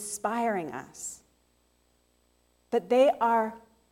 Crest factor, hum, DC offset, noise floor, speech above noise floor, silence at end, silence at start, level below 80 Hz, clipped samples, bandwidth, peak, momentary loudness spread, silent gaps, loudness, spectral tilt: 18 dB; 60 Hz at -60 dBFS; under 0.1%; -69 dBFS; 42 dB; 0.35 s; 0 s; -72 dBFS; under 0.1%; 16.5 kHz; -12 dBFS; 16 LU; none; -28 LUFS; -3.5 dB/octave